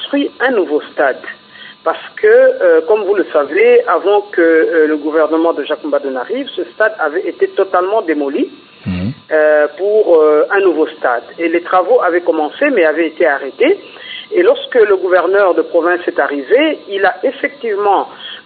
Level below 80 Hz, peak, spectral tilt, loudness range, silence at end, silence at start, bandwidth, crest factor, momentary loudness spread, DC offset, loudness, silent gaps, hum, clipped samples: -60 dBFS; 0 dBFS; -9.5 dB/octave; 4 LU; 0.05 s; 0 s; 4.7 kHz; 12 dB; 10 LU; under 0.1%; -13 LUFS; none; none; under 0.1%